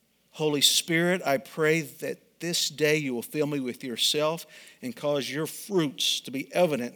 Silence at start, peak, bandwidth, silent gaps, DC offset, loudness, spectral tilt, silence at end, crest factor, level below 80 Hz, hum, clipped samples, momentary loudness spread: 0.35 s; -6 dBFS; over 20 kHz; none; under 0.1%; -26 LUFS; -3 dB/octave; 0.05 s; 22 dB; -82 dBFS; none; under 0.1%; 14 LU